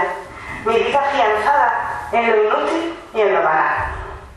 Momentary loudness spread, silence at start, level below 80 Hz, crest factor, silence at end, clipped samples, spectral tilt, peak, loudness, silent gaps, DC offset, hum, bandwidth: 10 LU; 0 s; -42 dBFS; 14 dB; 0 s; under 0.1%; -4.5 dB/octave; -4 dBFS; -17 LUFS; none; under 0.1%; none; 12 kHz